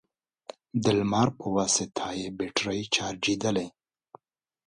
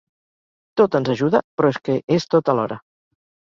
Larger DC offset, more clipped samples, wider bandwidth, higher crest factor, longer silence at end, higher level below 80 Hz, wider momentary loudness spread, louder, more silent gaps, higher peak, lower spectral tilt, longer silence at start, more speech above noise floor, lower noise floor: neither; neither; first, 11 kHz vs 7.4 kHz; about the same, 22 dB vs 18 dB; first, 1 s vs 0.8 s; about the same, -60 dBFS vs -62 dBFS; first, 13 LU vs 8 LU; second, -27 LUFS vs -20 LUFS; second, none vs 1.44-1.58 s; second, -8 dBFS vs -2 dBFS; second, -3.5 dB/octave vs -7 dB/octave; about the same, 0.75 s vs 0.75 s; second, 38 dB vs over 71 dB; second, -65 dBFS vs under -90 dBFS